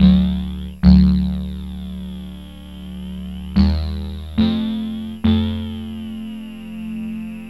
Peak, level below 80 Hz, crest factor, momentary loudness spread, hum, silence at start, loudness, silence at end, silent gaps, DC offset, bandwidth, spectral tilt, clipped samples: 0 dBFS; -26 dBFS; 18 dB; 19 LU; none; 0 s; -20 LUFS; 0 s; none; 0.5%; 11.5 kHz; -8.5 dB/octave; under 0.1%